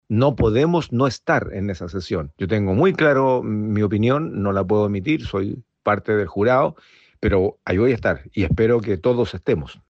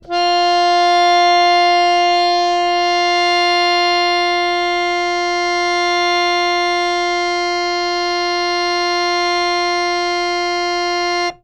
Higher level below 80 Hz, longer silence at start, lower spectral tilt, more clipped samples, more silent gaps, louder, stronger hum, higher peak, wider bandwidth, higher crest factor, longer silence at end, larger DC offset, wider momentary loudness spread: first, -40 dBFS vs -48 dBFS; about the same, 0.1 s vs 0.05 s; first, -8 dB/octave vs -1.5 dB/octave; neither; neither; second, -20 LUFS vs -15 LUFS; neither; about the same, -6 dBFS vs -4 dBFS; second, 7.8 kHz vs 10.5 kHz; about the same, 14 dB vs 12 dB; about the same, 0.15 s vs 0.1 s; neither; first, 8 LU vs 5 LU